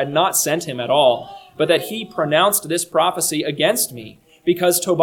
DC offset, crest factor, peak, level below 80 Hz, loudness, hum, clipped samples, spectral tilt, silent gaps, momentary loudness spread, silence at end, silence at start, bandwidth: under 0.1%; 18 dB; 0 dBFS; -62 dBFS; -18 LUFS; none; under 0.1%; -3 dB/octave; none; 9 LU; 0 s; 0 s; 19 kHz